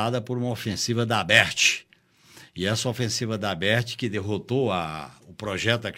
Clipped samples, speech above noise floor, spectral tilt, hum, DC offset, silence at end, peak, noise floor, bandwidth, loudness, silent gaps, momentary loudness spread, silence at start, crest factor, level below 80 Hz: under 0.1%; 32 dB; -3.5 dB/octave; none; under 0.1%; 0 s; -2 dBFS; -57 dBFS; 16 kHz; -24 LUFS; none; 14 LU; 0 s; 24 dB; -60 dBFS